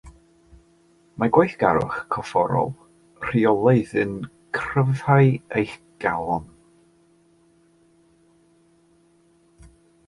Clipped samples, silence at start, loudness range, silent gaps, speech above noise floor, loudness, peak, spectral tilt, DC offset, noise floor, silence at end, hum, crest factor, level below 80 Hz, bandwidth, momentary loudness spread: under 0.1%; 0.05 s; 11 LU; none; 38 dB; -22 LUFS; -2 dBFS; -8.5 dB/octave; under 0.1%; -59 dBFS; 3.6 s; none; 22 dB; -54 dBFS; 11.5 kHz; 12 LU